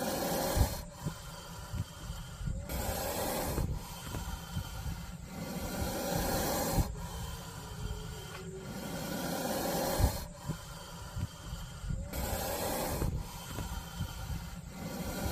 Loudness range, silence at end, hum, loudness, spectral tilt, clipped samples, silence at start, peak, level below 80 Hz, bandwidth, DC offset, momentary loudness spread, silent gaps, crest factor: 2 LU; 0 s; none; -37 LUFS; -4.5 dB/octave; under 0.1%; 0 s; -14 dBFS; -42 dBFS; 16 kHz; under 0.1%; 11 LU; none; 22 dB